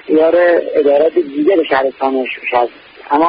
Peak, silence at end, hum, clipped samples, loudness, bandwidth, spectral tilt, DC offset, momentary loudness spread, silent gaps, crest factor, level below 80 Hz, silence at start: -2 dBFS; 0 s; none; under 0.1%; -13 LUFS; 5.2 kHz; -10 dB/octave; under 0.1%; 7 LU; none; 10 dB; -56 dBFS; 0.05 s